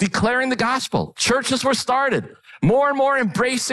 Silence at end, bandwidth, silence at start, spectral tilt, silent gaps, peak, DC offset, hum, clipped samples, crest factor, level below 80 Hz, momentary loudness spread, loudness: 0 s; 12 kHz; 0 s; -4 dB/octave; none; -10 dBFS; under 0.1%; none; under 0.1%; 10 dB; -48 dBFS; 4 LU; -19 LUFS